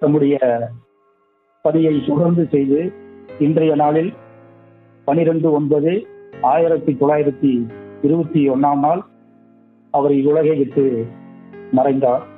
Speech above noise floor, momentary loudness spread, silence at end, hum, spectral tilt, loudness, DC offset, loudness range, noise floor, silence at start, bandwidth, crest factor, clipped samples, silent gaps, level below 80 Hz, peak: 45 dB; 8 LU; 0.1 s; none; -12.5 dB/octave; -17 LUFS; under 0.1%; 1 LU; -60 dBFS; 0 s; 3.9 kHz; 14 dB; under 0.1%; none; -64 dBFS; -2 dBFS